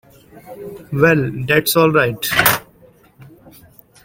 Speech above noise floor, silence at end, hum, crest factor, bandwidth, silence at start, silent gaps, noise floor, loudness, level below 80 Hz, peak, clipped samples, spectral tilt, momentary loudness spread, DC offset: 33 dB; 0.8 s; none; 18 dB; 17 kHz; 0.35 s; none; -49 dBFS; -15 LUFS; -48 dBFS; 0 dBFS; under 0.1%; -4.5 dB/octave; 19 LU; under 0.1%